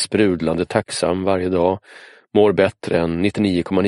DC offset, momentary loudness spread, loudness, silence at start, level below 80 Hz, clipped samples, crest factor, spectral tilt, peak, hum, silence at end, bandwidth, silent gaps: under 0.1%; 5 LU; -19 LUFS; 0 s; -48 dBFS; under 0.1%; 18 dB; -5.5 dB/octave; -2 dBFS; none; 0 s; 11.5 kHz; none